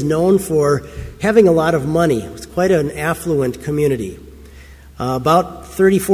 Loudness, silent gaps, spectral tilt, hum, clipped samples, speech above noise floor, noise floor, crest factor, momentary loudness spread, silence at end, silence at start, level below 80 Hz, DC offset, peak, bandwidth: -16 LUFS; none; -6.5 dB/octave; none; under 0.1%; 24 dB; -39 dBFS; 16 dB; 11 LU; 0 s; 0 s; -40 dBFS; under 0.1%; 0 dBFS; 16 kHz